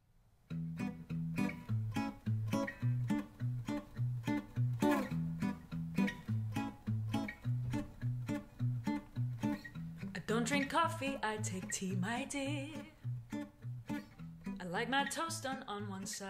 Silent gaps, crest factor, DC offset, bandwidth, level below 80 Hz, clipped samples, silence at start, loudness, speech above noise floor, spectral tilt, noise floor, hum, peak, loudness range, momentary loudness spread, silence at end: none; 18 dB; under 0.1%; 16 kHz; -60 dBFS; under 0.1%; 0.5 s; -39 LUFS; 31 dB; -5.5 dB/octave; -68 dBFS; none; -20 dBFS; 3 LU; 11 LU; 0 s